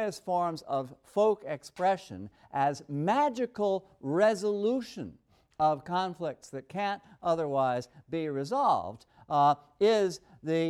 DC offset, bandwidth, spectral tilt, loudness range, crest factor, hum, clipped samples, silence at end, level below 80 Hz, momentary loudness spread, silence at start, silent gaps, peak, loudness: under 0.1%; 13 kHz; -6 dB/octave; 3 LU; 16 dB; none; under 0.1%; 0 s; -70 dBFS; 12 LU; 0 s; none; -14 dBFS; -30 LUFS